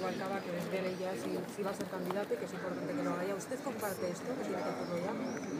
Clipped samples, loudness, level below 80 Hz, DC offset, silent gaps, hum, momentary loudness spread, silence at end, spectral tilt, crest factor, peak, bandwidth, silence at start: under 0.1%; -38 LUFS; -78 dBFS; under 0.1%; none; none; 3 LU; 0 s; -5.5 dB/octave; 16 dB; -22 dBFS; 15.5 kHz; 0 s